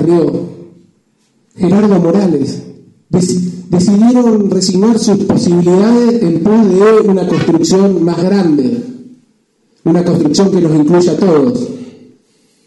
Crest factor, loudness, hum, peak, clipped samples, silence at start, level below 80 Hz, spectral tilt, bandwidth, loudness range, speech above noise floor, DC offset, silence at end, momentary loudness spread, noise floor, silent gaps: 10 dB; -10 LUFS; none; 0 dBFS; under 0.1%; 0 s; -48 dBFS; -6.5 dB/octave; 11.5 kHz; 4 LU; 47 dB; under 0.1%; 0.75 s; 9 LU; -56 dBFS; none